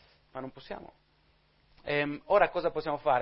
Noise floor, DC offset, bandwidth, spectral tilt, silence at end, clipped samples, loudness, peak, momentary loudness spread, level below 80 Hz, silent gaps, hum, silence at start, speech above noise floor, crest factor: -67 dBFS; under 0.1%; 5.8 kHz; -9 dB/octave; 0 s; under 0.1%; -29 LUFS; -10 dBFS; 19 LU; -58 dBFS; none; none; 0.35 s; 38 dB; 22 dB